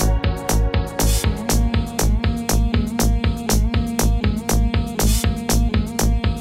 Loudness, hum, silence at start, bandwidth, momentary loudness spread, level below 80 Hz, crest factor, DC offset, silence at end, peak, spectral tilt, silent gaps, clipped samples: -20 LUFS; none; 0 s; 16.5 kHz; 2 LU; -20 dBFS; 16 dB; 0.6%; 0 s; -2 dBFS; -5 dB/octave; none; under 0.1%